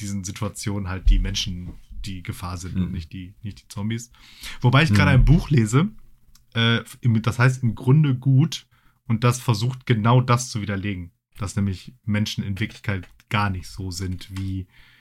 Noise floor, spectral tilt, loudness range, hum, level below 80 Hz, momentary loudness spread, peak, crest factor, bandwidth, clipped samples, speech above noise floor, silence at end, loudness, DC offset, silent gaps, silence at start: -51 dBFS; -6 dB/octave; 8 LU; none; -32 dBFS; 17 LU; -4 dBFS; 18 dB; 13 kHz; under 0.1%; 29 dB; 0.35 s; -22 LUFS; under 0.1%; none; 0 s